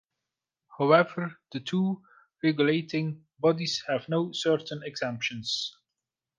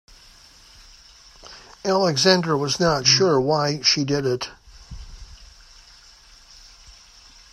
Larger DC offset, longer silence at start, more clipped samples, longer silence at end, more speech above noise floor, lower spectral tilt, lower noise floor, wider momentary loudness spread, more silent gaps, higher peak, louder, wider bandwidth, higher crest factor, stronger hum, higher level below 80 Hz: neither; second, 0.7 s vs 1.45 s; neither; about the same, 0.7 s vs 0.6 s; first, 60 dB vs 30 dB; first, -5.5 dB/octave vs -3.5 dB/octave; first, -88 dBFS vs -49 dBFS; second, 13 LU vs 26 LU; neither; second, -6 dBFS vs 0 dBFS; second, -28 LUFS vs -19 LUFS; second, 9.8 kHz vs 13.5 kHz; about the same, 22 dB vs 24 dB; neither; second, -74 dBFS vs -48 dBFS